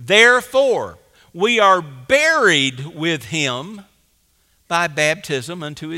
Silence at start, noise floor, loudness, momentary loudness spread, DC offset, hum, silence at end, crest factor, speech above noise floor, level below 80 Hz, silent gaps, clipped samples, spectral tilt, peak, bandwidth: 0 s; -61 dBFS; -16 LUFS; 14 LU; under 0.1%; none; 0 s; 18 dB; 44 dB; -58 dBFS; none; under 0.1%; -3 dB/octave; 0 dBFS; 16.5 kHz